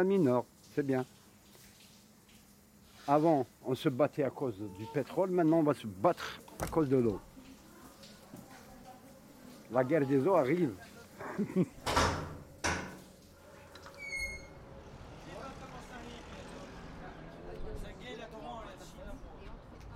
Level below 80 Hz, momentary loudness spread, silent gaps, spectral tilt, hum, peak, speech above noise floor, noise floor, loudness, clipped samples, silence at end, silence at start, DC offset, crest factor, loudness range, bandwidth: -54 dBFS; 24 LU; none; -6 dB/octave; none; -14 dBFS; 29 dB; -60 dBFS; -33 LUFS; under 0.1%; 0 s; 0 s; under 0.1%; 22 dB; 15 LU; 16.5 kHz